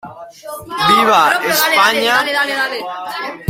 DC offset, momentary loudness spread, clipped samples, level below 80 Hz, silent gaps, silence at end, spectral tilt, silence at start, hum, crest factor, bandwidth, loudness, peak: under 0.1%; 20 LU; under 0.1%; -54 dBFS; none; 0 s; -2 dB/octave; 0.05 s; none; 14 dB; 16.5 kHz; -13 LUFS; 0 dBFS